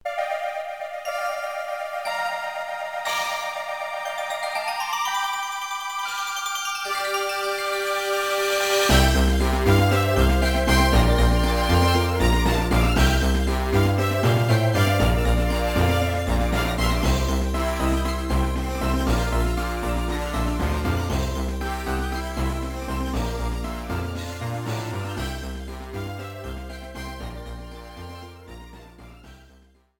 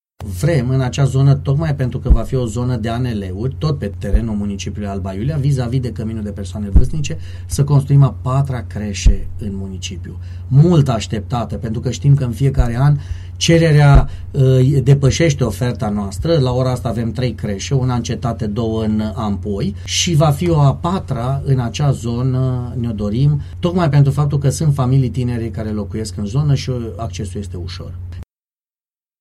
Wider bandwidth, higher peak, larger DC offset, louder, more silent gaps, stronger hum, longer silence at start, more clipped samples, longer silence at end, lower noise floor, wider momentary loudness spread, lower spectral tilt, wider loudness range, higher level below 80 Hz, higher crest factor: first, 19 kHz vs 12 kHz; about the same, -4 dBFS vs -2 dBFS; neither; second, -23 LUFS vs -17 LUFS; neither; neither; second, 0.05 s vs 0.2 s; neither; second, 0.65 s vs 0.95 s; second, -55 dBFS vs under -90 dBFS; about the same, 14 LU vs 12 LU; second, -5 dB/octave vs -6.5 dB/octave; first, 12 LU vs 6 LU; about the same, -28 dBFS vs -26 dBFS; about the same, 18 dB vs 14 dB